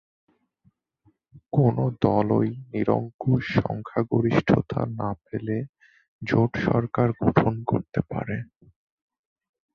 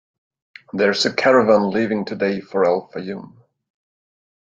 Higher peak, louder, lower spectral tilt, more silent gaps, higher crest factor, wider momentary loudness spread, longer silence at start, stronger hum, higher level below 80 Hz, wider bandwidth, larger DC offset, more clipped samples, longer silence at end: about the same, -4 dBFS vs -2 dBFS; second, -25 LUFS vs -18 LUFS; first, -9.5 dB/octave vs -5 dB/octave; first, 3.14-3.19 s, 5.69-5.73 s, 6.08-6.19 s vs none; about the same, 22 dB vs 18 dB; second, 10 LU vs 16 LU; first, 1.35 s vs 0.75 s; neither; first, -50 dBFS vs -64 dBFS; second, 6.6 kHz vs 9 kHz; neither; neither; about the same, 1.3 s vs 1.2 s